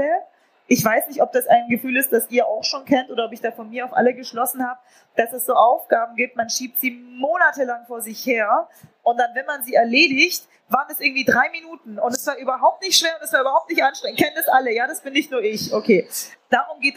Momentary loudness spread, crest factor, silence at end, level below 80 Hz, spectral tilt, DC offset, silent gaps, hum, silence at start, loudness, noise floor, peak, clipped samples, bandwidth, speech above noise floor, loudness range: 10 LU; 18 dB; 0.05 s; -70 dBFS; -2.5 dB/octave; under 0.1%; none; none; 0 s; -20 LUFS; -46 dBFS; -2 dBFS; under 0.1%; 15.5 kHz; 25 dB; 3 LU